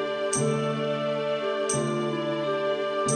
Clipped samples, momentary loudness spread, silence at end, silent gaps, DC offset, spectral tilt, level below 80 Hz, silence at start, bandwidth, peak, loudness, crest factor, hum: under 0.1%; 2 LU; 0 s; none; under 0.1%; -4 dB/octave; -66 dBFS; 0 s; 10 kHz; -10 dBFS; -27 LUFS; 16 dB; none